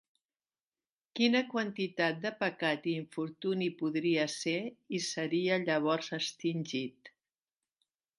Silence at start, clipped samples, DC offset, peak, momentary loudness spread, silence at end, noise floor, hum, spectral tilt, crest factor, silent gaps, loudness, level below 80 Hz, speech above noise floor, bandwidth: 1.15 s; under 0.1%; under 0.1%; -16 dBFS; 7 LU; 1.1 s; under -90 dBFS; none; -4.5 dB/octave; 20 dB; none; -33 LUFS; -84 dBFS; over 57 dB; 11.5 kHz